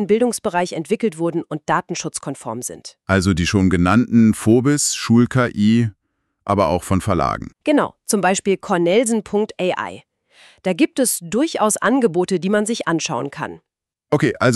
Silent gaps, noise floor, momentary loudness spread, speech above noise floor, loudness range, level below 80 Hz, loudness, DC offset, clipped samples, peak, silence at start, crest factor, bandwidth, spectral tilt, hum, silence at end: none; -51 dBFS; 11 LU; 33 dB; 4 LU; -44 dBFS; -18 LUFS; under 0.1%; under 0.1%; -4 dBFS; 0 s; 14 dB; 13.5 kHz; -5 dB/octave; none; 0 s